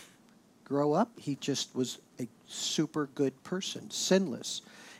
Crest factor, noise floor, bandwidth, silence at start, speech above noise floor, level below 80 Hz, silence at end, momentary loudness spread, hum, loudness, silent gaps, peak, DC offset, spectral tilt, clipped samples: 20 dB; -61 dBFS; 16.5 kHz; 0 s; 29 dB; -84 dBFS; 0 s; 12 LU; none; -33 LUFS; none; -12 dBFS; under 0.1%; -4 dB/octave; under 0.1%